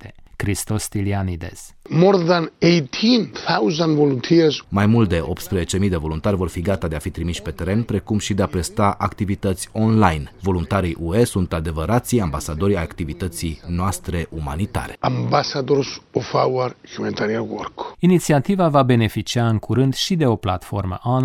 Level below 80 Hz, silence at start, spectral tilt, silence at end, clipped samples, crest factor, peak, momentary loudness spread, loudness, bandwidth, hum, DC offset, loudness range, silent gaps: -38 dBFS; 0 s; -6 dB/octave; 0 s; under 0.1%; 18 dB; 0 dBFS; 10 LU; -20 LUFS; 16.5 kHz; none; under 0.1%; 5 LU; none